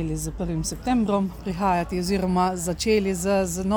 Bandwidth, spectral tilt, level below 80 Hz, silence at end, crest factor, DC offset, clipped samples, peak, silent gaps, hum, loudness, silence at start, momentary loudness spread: 19 kHz; -5.5 dB/octave; -38 dBFS; 0 s; 14 dB; under 0.1%; under 0.1%; -10 dBFS; none; none; -24 LUFS; 0 s; 6 LU